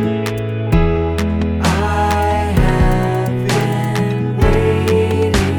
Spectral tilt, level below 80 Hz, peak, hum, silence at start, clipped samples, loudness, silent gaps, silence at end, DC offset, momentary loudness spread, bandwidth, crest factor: -6.5 dB/octave; -22 dBFS; 0 dBFS; none; 0 s; under 0.1%; -16 LUFS; none; 0 s; under 0.1%; 4 LU; 19 kHz; 14 dB